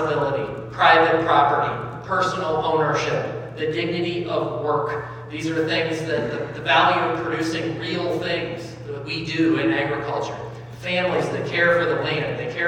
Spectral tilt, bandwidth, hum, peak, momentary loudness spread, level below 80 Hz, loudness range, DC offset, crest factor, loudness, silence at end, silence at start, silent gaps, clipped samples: -5.5 dB/octave; 10.5 kHz; none; -2 dBFS; 13 LU; -54 dBFS; 5 LU; under 0.1%; 20 dB; -22 LUFS; 0 s; 0 s; none; under 0.1%